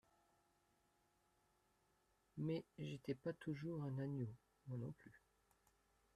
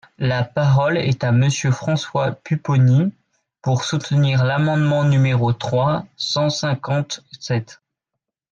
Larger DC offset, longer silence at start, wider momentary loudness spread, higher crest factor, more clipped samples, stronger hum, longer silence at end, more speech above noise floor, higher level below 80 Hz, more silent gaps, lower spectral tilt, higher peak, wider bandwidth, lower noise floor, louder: neither; first, 2.35 s vs 0.2 s; first, 13 LU vs 8 LU; first, 20 dB vs 12 dB; neither; neither; first, 1 s vs 0.8 s; second, 34 dB vs 64 dB; second, -80 dBFS vs -54 dBFS; neither; first, -8.5 dB/octave vs -6 dB/octave; second, -32 dBFS vs -6 dBFS; first, 13 kHz vs 7.8 kHz; about the same, -81 dBFS vs -82 dBFS; second, -49 LUFS vs -19 LUFS